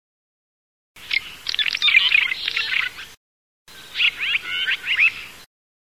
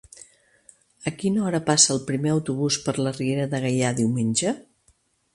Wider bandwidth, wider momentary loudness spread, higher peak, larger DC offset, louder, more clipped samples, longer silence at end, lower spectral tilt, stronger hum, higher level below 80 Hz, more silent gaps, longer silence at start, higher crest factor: first, 16 kHz vs 11.5 kHz; first, 15 LU vs 10 LU; about the same, -2 dBFS vs -2 dBFS; first, 0.3% vs under 0.1%; first, -18 LUFS vs -23 LUFS; neither; second, 0.4 s vs 0.75 s; second, 1 dB/octave vs -4 dB/octave; neither; about the same, -60 dBFS vs -62 dBFS; first, 3.17-3.65 s vs none; about the same, 0.95 s vs 1 s; about the same, 20 dB vs 22 dB